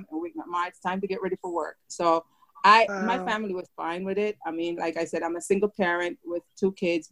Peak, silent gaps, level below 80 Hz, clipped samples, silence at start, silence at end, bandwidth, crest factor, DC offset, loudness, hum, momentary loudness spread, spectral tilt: -4 dBFS; none; -68 dBFS; under 0.1%; 0 s; 0.05 s; 12.5 kHz; 24 dB; under 0.1%; -27 LUFS; none; 12 LU; -4.5 dB/octave